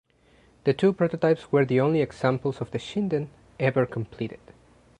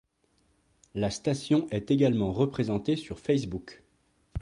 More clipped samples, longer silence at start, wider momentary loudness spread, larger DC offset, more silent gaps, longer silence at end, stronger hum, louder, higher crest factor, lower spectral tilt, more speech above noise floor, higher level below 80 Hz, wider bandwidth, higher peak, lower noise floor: neither; second, 0.65 s vs 0.95 s; second, 10 LU vs 13 LU; neither; neither; first, 0.65 s vs 0 s; neither; first, -25 LUFS vs -28 LUFS; about the same, 18 dB vs 18 dB; first, -8 dB/octave vs -6.5 dB/octave; second, 35 dB vs 42 dB; second, -60 dBFS vs -54 dBFS; second, 10 kHz vs 11.5 kHz; first, -8 dBFS vs -12 dBFS; second, -59 dBFS vs -70 dBFS